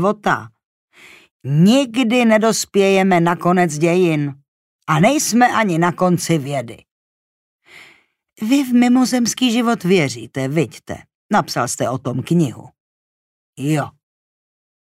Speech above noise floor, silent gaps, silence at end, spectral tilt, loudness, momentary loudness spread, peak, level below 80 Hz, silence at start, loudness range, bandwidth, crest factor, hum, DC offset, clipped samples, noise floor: 36 dB; 0.65-0.88 s, 1.31-1.40 s, 4.48-4.79 s, 6.91-7.59 s, 11.15-11.29 s, 12.80-13.53 s; 0.95 s; -5 dB/octave; -16 LUFS; 12 LU; -2 dBFS; -60 dBFS; 0 s; 6 LU; 16 kHz; 14 dB; none; under 0.1%; under 0.1%; -52 dBFS